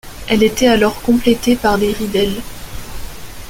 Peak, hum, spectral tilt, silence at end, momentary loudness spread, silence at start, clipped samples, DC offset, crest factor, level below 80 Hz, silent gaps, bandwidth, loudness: 0 dBFS; none; -4.5 dB/octave; 0 s; 19 LU; 0.05 s; under 0.1%; under 0.1%; 14 dB; -32 dBFS; none; 17 kHz; -14 LUFS